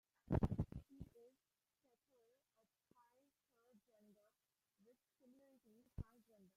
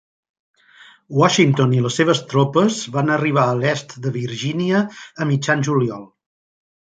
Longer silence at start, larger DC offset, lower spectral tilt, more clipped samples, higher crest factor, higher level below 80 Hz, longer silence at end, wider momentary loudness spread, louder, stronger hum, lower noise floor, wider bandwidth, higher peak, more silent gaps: second, 0.3 s vs 1.1 s; neither; first, -10 dB/octave vs -5.5 dB/octave; neither; first, 28 dB vs 18 dB; about the same, -62 dBFS vs -62 dBFS; second, 0.55 s vs 0.8 s; first, 20 LU vs 10 LU; second, -46 LUFS vs -18 LUFS; neither; first, under -90 dBFS vs -48 dBFS; first, 15 kHz vs 9.2 kHz; second, -24 dBFS vs -2 dBFS; neither